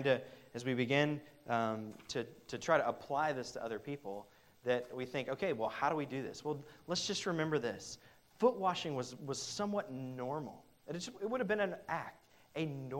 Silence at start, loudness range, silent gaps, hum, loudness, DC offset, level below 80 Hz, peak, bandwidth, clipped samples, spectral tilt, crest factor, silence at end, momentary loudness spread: 0 s; 3 LU; none; none; -38 LUFS; under 0.1%; -74 dBFS; -16 dBFS; 16 kHz; under 0.1%; -4.5 dB/octave; 22 dB; 0 s; 12 LU